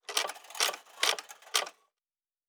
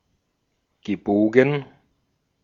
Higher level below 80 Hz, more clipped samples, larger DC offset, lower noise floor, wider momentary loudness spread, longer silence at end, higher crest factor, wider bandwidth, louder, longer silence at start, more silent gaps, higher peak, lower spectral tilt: second, under -90 dBFS vs -62 dBFS; neither; neither; first, under -90 dBFS vs -73 dBFS; second, 8 LU vs 13 LU; about the same, 0.75 s vs 0.8 s; about the same, 26 dB vs 22 dB; first, over 20 kHz vs 7.2 kHz; second, -31 LUFS vs -21 LUFS; second, 0.1 s vs 0.85 s; neither; second, -10 dBFS vs -2 dBFS; second, 3.5 dB/octave vs -8 dB/octave